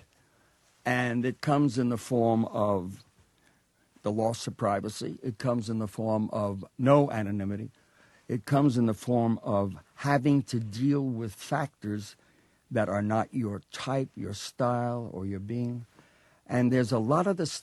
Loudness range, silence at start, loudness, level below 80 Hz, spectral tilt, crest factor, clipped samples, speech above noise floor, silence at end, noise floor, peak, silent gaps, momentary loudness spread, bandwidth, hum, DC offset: 5 LU; 0.85 s; -29 LUFS; -66 dBFS; -7 dB/octave; 20 dB; under 0.1%; 39 dB; 0 s; -67 dBFS; -8 dBFS; none; 11 LU; 12.5 kHz; none; under 0.1%